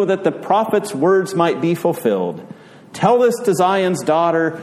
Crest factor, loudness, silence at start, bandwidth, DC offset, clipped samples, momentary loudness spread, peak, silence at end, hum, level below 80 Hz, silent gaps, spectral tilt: 14 dB; -17 LUFS; 0 s; 15.5 kHz; under 0.1%; under 0.1%; 5 LU; -2 dBFS; 0 s; none; -64 dBFS; none; -6 dB/octave